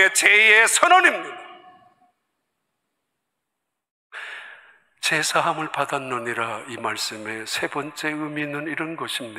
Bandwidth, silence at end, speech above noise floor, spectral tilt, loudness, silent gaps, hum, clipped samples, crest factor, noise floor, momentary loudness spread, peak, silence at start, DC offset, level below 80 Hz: 16 kHz; 0 s; 60 dB; -1.5 dB/octave; -19 LUFS; 3.90-4.10 s; none; under 0.1%; 22 dB; -81 dBFS; 22 LU; 0 dBFS; 0 s; under 0.1%; -76 dBFS